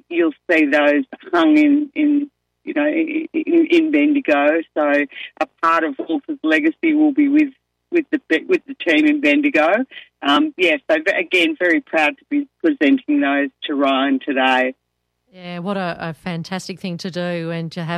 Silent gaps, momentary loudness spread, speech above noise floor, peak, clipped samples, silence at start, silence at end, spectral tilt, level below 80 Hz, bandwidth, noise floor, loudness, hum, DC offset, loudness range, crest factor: none; 11 LU; 54 dB; -4 dBFS; under 0.1%; 0.1 s; 0 s; -5.5 dB/octave; -66 dBFS; 9.2 kHz; -72 dBFS; -18 LUFS; none; under 0.1%; 4 LU; 14 dB